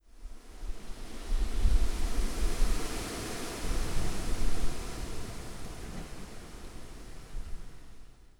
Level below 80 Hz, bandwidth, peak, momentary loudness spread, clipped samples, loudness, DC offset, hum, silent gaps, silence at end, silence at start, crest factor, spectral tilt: -32 dBFS; 15.5 kHz; -12 dBFS; 16 LU; under 0.1%; -38 LUFS; under 0.1%; none; none; 0.35 s; 0.15 s; 16 dB; -4.5 dB/octave